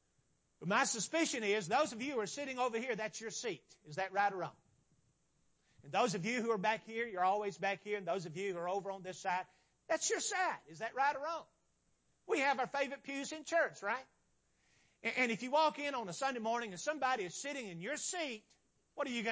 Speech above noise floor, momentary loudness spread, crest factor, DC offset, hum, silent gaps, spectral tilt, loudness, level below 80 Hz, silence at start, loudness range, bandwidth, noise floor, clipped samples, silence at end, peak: 40 dB; 9 LU; 20 dB; under 0.1%; none; none; -3 dB/octave; -37 LUFS; -84 dBFS; 0.6 s; 3 LU; 8 kHz; -78 dBFS; under 0.1%; 0 s; -18 dBFS